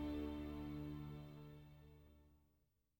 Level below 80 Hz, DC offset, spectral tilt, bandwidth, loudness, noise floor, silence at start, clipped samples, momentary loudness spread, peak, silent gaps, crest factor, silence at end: -60 dBFS; under 0.1%; -8 dB/octave; over 20 kHz; -51 LUFS; -82 dBFS; 0 s; under 0.1%; 19 LU; -36 dBFS; none; 14 dB; 0.6 s